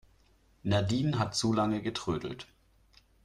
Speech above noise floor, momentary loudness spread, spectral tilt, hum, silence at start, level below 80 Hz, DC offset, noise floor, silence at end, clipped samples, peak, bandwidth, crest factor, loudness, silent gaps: 35 dB; 13 LU; -5.5 dB/octave; none; 0.65 s; -58 dBFS; under 0.1%; -65 dBFS; 0.8 s; under 0.1%; -16 dBFS; 12.5 kHz; 18 dB; -31 LUFS; none